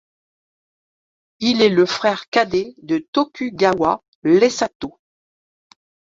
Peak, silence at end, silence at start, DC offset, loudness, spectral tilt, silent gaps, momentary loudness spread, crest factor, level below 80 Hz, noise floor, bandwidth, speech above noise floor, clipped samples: -2 dBFS; 1.2 s; 1.4 s; under 0.1%; -18 LUFS; -4.5 dB/octave; 2.28-2.32 s, 3.08-3.13 s, 4.08-4.22 s, 4.75-4.80 s; 9 LU; 20 dB; -58 dBFS; under -90 dBFS; 7.8 kHz; over 72 dB; under 0.1%